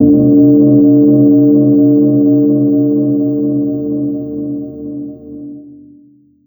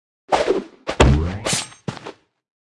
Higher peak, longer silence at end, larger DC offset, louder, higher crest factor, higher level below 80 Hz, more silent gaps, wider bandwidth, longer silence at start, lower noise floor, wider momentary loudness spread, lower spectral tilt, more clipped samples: about the same, 0 dBFS vs 0 dBFS; first, 0.75 s vs 0.5 s; neither; first, -10 LUFS vs -20 LUFS; second, 10 dB vs 22 dB; second, -46 dBFS vs -28 dBFS; neither; second, 1.2 kHz vs 12 kHz; second, 0 s vs 0.3 s; first, -45 dBFS vs -40 dBFS; about the same, 18 LU vs 16 LU; first, -16.5 dB/octave vs -4.5 dB/octave; neither